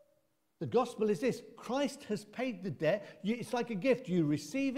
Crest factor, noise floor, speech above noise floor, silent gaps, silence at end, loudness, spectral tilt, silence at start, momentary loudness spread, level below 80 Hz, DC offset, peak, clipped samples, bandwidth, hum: 18 dB; -76 dBFS; 42 dB; none; 0 s; -35 LUFS; -6 dB/octave; 0.6 s; 7 LU; -74 dBFS; under 0.1%; -18 dBFS; under 0.1%; 16 kHz; none